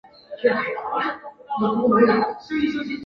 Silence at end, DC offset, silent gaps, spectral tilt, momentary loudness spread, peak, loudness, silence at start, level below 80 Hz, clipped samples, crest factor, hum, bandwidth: 0 s; under 0.1%; none; -7.5 dB/octave; 12 LU; -6 dBFS; -22 LUFS; 0.3 s; -60 dBFS; under 0.1%; 18 dB; none; 6.6 kHz